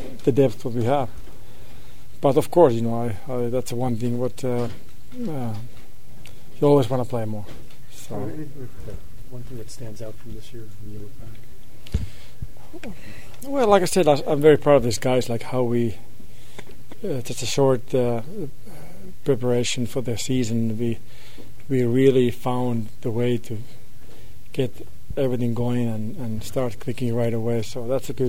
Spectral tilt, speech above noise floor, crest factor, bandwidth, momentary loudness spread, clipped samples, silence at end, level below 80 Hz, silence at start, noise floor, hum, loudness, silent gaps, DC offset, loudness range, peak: -6.5 dB/octave; 22 dB; 22 dB; 16 kHz; 23 LU; under 0.1%; 0 s; -44 dBFS; 0 s; -45 dBFS; none; -23 LUFS; none; 6%; 17 LU; 0 dBFS